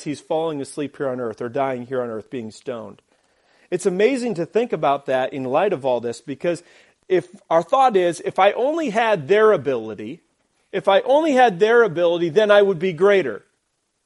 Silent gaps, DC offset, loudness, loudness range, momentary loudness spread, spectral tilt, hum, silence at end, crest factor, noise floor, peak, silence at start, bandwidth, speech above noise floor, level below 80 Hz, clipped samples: none; under 0.1%; -19 LUFS; 8 LU; 14 LU; -5.5 dB/octave; none; 0.7 s; 20 dB; -72 dBFS; 0 dBFS; 0 s; 11.5 kHz; 52 dB; -70 dBFS; under 0.1%